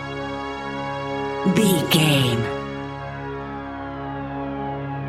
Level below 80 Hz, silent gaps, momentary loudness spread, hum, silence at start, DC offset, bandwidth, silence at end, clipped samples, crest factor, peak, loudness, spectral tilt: -46 dBFS; none; 14 LU; none; 0 s; under 0.1%; 16 kHz; 0 s; under 0.1%; 20 dB; -4 dBFS; -23 LUFS; -5 dB/octave